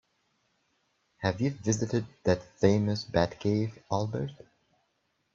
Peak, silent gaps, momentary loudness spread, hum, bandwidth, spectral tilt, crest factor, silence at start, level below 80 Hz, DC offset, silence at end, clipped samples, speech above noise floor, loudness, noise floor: -8 dBFS; none; 7 LU; none; 7.6 kHz; -6 dB/octave; 22 dB; 1.2 s; -58 dBFS; under 0.1%; 1 s; under 0.1%; 47 dB; -30 LUFS; -76 dBFS